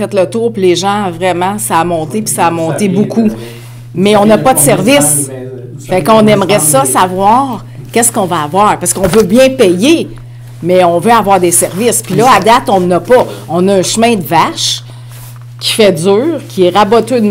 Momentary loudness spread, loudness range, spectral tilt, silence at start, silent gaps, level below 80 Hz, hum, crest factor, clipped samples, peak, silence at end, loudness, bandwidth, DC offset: 12 LU; 3 LU; -4 dB/octave; 0 s; none; -38 dBFS; none; 10 dB; 1%; 0 dBFS; 0 s; -9 LUFS; 16.5 kHz; 0.1%